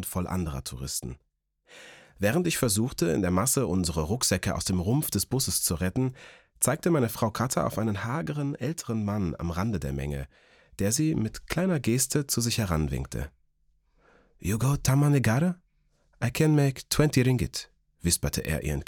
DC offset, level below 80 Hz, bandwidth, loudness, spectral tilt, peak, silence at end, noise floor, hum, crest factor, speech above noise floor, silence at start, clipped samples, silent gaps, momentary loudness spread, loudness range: under 0.1%; -46 dBFS; 19 kHz; -27 LUFS; -5 dB/octave; -8 dBFS; 0.05 s; -68 dBFS; none; 20 dB; 41 dB; 0 s; under 0.1%; none; 9 LU; 4 LU